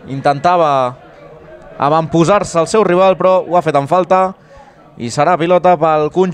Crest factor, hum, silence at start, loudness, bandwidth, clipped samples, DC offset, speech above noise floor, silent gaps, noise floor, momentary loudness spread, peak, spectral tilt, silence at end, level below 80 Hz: 12 dB; none; 0.05 s; -12 LUFS; 10.5 kHz; under 0.1%; under 0.1%; 28 dB; none; -40 dBFS; 6 LU; 0 dBFS; -6 dB/octave; 0 s; -48 dBFS